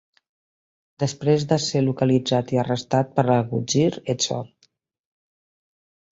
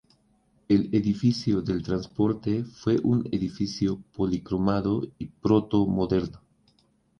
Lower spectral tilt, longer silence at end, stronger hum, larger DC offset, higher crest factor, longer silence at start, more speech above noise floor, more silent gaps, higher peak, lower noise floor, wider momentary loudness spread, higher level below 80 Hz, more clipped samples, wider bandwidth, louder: second, -5.5 dB/octave vs -8 dB/octave; first, 1.7 s vs 0.85 s; neither; neither; about the same, 18 dB vs 18 dB; first, 1 s vs 0.7 s; about the same, 44 dB vs 41 dB; neither; about the same, -6 dBFS vs -8 dBFS; about the same, -65 dBFS vs -66 dBFS; about the same, 6 LU vs 7 LU; second, -60 dBFS vs -50 dBFS; neither; first, 8 kHz vs 7.2 kHz; first, -22 LUFS vs -26 LUFS